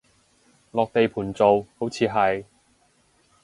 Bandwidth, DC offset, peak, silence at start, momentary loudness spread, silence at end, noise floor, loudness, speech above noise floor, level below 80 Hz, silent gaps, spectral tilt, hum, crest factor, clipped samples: 11.5 kHz; under 0.1%; -4 dBFS; 0.75 s; 11 LU; 1 s; -63 dBFS; -23 LUFS; 41 dB; -58 dBFS; none; -6 dB/octave; none; 20 dB; under 0.1%